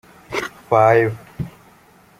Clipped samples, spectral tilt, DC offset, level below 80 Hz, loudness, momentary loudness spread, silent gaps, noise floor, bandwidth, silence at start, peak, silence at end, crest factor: under 0.1%; -6.5 dB/octave; under 0.1%; -52 dBFS; -18 LUFS; 18 LU; none; -50 dBFS; 16 kHz; 0.3 s; -2 dBFS; 0.7 s; 18 dB